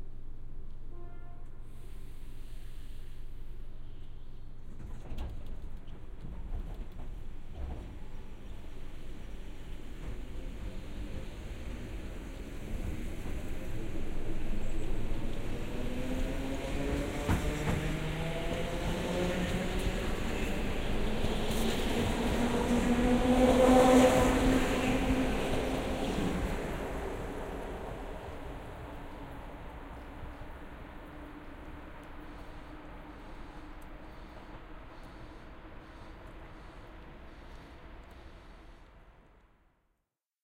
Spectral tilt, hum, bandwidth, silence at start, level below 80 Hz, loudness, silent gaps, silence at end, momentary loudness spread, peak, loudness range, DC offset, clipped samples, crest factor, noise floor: -5.5 dB/octave; none; 16 kHz; 0 s; -38 dBFS; -33 LUFS; none; 1.3 s; 22 LU; -12 dBFS; 24 LU; under 0.1%; under 0.1%; 22 dB; -85 dBFS